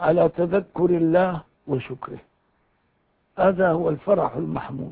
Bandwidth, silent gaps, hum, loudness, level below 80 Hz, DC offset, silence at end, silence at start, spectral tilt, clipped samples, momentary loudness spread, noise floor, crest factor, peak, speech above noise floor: 4.7 kHz; none; none; -22 LUFS; -54 dBFS; under 0.1%; 0 s; 0 s; -12 dB/octave; under 0.1%; 16 LU; -67 dBFS; 18 dB; -6 dBFS; 46 dB